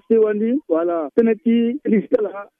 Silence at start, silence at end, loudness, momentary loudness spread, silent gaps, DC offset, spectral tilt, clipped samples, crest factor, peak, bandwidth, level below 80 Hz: 0.1 s; 0.15 s; -19 LUFS; 4 LU; none; under 0.1%; -10 dB/octave; under 0.1%; 14 dB; -4 dBFS; 3.6 kHz; -64 dBFS